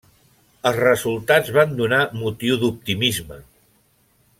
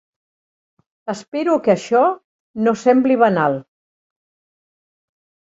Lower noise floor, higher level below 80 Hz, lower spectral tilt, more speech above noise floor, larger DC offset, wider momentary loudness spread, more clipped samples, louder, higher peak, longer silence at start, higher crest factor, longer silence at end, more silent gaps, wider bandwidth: second, -61 dBFS vs under -90 dBFS; first, -54 dBFS vs -66 dBFS; second, -4.5 dB/octave vs -6.5 dB/octave; second, 41 dB vs over 74 dB; neither; second, 7 LU vs 15 LU; neither; about the same, -19 LUFS vs -17 LUFS; about the same, -2 dBFS vs -2 dBFS; second, 0.65 s vs 1.05 s; about the same, 18 dB vs 18 dB; second, 0.95 s vs 1.9 s; second, none vs 1.28-1.32 s, 2.24-2.54 s; first, 16.5 kHz vs 8 kHz